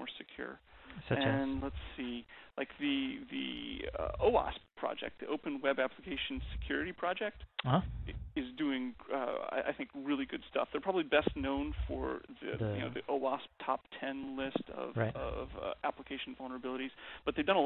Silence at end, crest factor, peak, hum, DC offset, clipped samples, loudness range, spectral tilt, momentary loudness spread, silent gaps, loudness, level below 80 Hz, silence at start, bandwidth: 0 s; 22 dB; -16 dBFS; none; under 0.1%; under 0.1%; 3 LU; -4 dB/octave; 11 LU; none; -37 LUFS; -52 dBFS; 0 s; 4.3 kHz